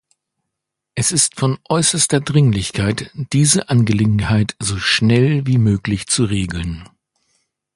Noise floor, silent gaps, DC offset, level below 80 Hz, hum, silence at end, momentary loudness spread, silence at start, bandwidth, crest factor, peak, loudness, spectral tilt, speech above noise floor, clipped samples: -80 dBFS; none; under 0.1%; -38 dBFS; none; 0.9 s; 7 LU; 0.95 s; 11.5 kHz; 18 dB; 0 dBFS; -16 LUFS; -4.5 dB/octave; 64 dB; under 0.1%